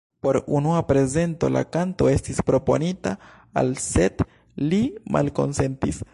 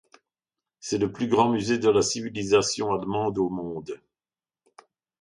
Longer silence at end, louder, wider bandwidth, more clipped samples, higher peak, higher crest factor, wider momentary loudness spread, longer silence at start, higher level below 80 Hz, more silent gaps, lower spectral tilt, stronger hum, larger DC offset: second, 0.1 s vs 1.25 s; about the same, -23 LUFS vs -25 LUFS; about the same, 11.5 kHz vs 11 kHz; neither; about the same, -6 dBFS vs -8 dBFS; about the same, 16 dB vs 18 dB; second, 8 LU vs 14 LU; second, 0.25 s vs 0.85 s; first, -40 dBFS vs -58 dBFS; neither; first, -6.5 dB/octave vs -4.5 dB/octave; neither; neither